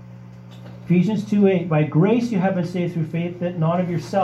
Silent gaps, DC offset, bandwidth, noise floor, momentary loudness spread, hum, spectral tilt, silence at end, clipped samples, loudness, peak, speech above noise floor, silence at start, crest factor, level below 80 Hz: none; under 0.1%; 8.2 kHz; -40 dBFS; 22 LU; none; -8.5 dB/octave; 0 s; under 0.1%; -20 LUFS; -6 dBFS; 20 dB; 0 s; 16 dB; -58 dBFS